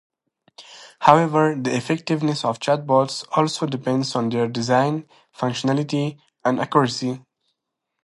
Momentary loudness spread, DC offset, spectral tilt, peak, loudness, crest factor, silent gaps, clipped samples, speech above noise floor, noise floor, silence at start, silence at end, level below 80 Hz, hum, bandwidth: 10 LU; under 0.1%; -5.5 dB/octave; 0 dBFS; -21 LUFS; 22 dB; none; under 0.1%; 59 dB; -80 dBFS; 0.6 s; 0.85 s; -66 dBFS; none; 11.5 kHz